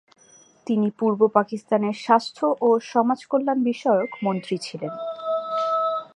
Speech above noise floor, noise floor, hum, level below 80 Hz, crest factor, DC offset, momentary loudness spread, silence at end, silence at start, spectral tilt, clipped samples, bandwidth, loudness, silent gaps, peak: 32 dB; -54 dBFS; none; -78 dBFS; 20 dB; under 0.1%; 9 LU; 0.1 s; 0.65 s; -6.5 dB/octave; under 0.1%; 11 kHz; -23 LUFS; none; -2 dBFS